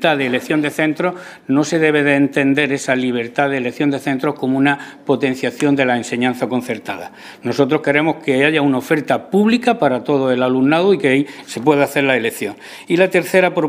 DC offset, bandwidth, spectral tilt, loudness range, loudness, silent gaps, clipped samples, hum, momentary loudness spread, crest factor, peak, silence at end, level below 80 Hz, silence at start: under 0.1%; 16 kHz; -5.5 dB/octave; 3 LU; -16 LUFS; none; under 0.1%; none; 8 LU; 16 dB; 0 dBFS; 0 s; -64 dBFS; 0 s